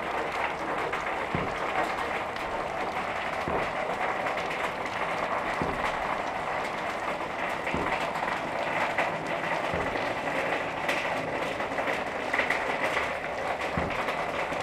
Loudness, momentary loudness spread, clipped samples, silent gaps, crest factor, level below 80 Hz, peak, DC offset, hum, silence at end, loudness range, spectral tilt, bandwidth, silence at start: -30 LUFS; 3 LU; under 0.1%; none; 18 dB; -52 dBFS; -12 dBFS; under 0.1%; none; 0 s; 1 LU; -4.5 dB/octave; 16.5 kHz; 0 s